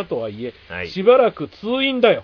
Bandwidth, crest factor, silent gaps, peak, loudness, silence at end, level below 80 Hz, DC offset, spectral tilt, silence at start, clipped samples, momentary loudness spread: 5.4 kHz; 16 dB; none; -2 dBFS; -18 LUFS; 0 s; -54 dBFS; under 0.1%; -7 dB/octave; 0 s; under 0.1%; 16 LU